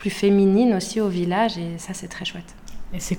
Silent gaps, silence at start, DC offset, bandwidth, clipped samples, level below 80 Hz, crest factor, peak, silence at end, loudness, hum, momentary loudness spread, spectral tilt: none; 0 s; under 0.1%; 17.5 kHz; under 0.1%; -44 dBFS; 14 dB; -8 dBFS; 0 s; -21 LUFS; none; 16 LU; -5.5 dB/octave